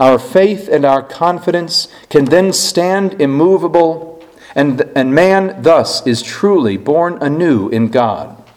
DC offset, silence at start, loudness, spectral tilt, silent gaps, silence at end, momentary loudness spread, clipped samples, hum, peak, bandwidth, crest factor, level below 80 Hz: under 0.1%; 0 s; -12 LUFS; -5 dB/octave; none; 0.2 s; 5 LU; 0.3%; none; 0 dBFS; 16 kHz; 12 dB; -52 dBFS